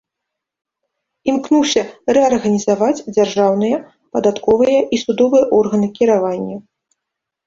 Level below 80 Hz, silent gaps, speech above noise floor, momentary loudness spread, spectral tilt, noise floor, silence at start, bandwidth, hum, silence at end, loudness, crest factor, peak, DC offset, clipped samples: -54 dBFS; none; 66 dB; 9 LU; -5 dB/octave; -80 dBFS; 1.25 s; 7.8 kHz; none; 0.85 s; -15 LUFS; 14 dB; -2 dBFS; under 0.1%; under 0.1%